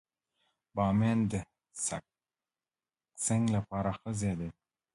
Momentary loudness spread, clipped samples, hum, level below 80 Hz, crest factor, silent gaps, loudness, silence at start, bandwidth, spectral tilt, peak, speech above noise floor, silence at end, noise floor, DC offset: 13 LU; under 0.1%; none; -56 dBFS; 18 dB; none; -33 LUFS; 0.75 s; 11.5 kHz; -6 dB/octave; -16 dBFS; over 59 dB; 0.45 s; under -90 dBFS; under 0.1%